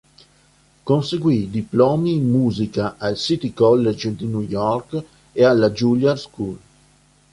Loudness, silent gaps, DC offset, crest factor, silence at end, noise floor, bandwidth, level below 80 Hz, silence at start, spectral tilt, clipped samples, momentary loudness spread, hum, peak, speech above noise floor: -19 LUFS; none; under 0.1%; 16 dB; 0.75 s; -56 dBFS; 11.5 kHz; -52 dBFS; 0.85 s; -7 dB/octave; under 0.1%; 14 LU; none; -4 dBFS; 37 dB